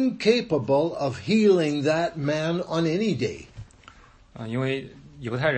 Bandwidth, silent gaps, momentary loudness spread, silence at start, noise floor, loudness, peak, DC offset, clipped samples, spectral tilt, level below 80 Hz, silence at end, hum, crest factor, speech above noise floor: 8.6 kHz; none; 15 LU; 0 s; -51 dBFS; -24 LUFS; -6 dBFS; under 0.1%; under 0.1%; -6.5 dB/octave; -56 dBFS; 0 s; none; 18 dB; 27 dB